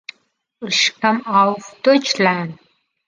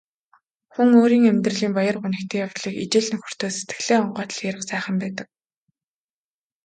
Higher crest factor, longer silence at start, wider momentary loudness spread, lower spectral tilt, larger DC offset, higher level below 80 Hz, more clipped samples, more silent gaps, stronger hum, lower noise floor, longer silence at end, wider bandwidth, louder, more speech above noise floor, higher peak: about the same, 18 dB vs 18 dB; second, 0.6 s vs 0.8 s; about the same, 14 LU vs 12 LU; second, -3.5 dB/octave vs -5 dB/octave; neither; about the same, -70 dBFS vs -68 dBFS; neither; neither; neither; second, -60 dBFS vs under -90 dBFS; second, 0.55 s vs 1.4 s; about the same, 9.8 kHz vs 9.2 kHz; first, -17 LUFS vs -21 LUFS; second, 43 dB vs over 69 dB; about the same, -2 dBFS vs -4 dBFS